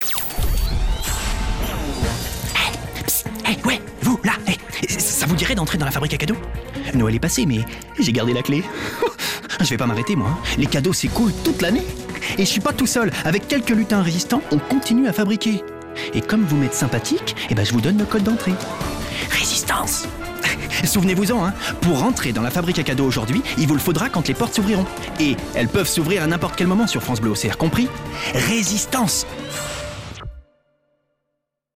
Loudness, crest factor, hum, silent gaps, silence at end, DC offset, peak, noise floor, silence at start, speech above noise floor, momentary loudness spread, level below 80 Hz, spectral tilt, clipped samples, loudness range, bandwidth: -20 LUFS; 12 dB; none; none; 1.35 s; under 0.1%; -8 dBFS; -78 dBFS; 0 s; 58 dB; 7 LU; -32 dBFS; -4.5 dB/octave; under 0.1%; 2 LU; 15.5 kHz